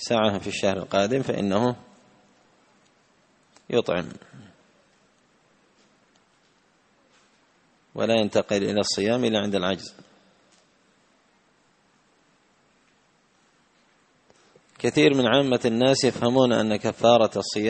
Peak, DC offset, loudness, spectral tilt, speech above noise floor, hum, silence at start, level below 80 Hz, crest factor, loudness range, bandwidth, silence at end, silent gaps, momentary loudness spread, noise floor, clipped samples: -4 dBFS; under 0.1%; -23 LUFS; -5 dB/octave; 41 dB; none; 0 s; -62 dBFS; 22 dB; 11 LU; 8.8 kHz; 0 s; none; 10 LU; -63 dBFS; under 0.1%